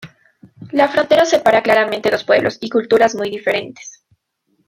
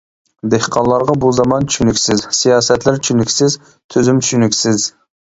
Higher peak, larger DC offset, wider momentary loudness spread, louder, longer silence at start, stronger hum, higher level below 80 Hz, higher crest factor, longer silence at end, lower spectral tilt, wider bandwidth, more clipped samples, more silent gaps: about the same, 0 dBFS vs 0 dBFS; neither; first, 9 LU vs 5 LU; about the same, -15 LUFS vs -13 LUFS; second, 0 s vs 0.45 s; neither; second, -58 dBFS vs -42 dBFS; about the same, 16 dB vs 14 dB; first, 0.75 s vs 0.35 s; about the same, -4 dB/octave vs -4 dB/octave; first, 15.5 kHz vs 8 kHz; neither; second, none vs 3.84-3.89 s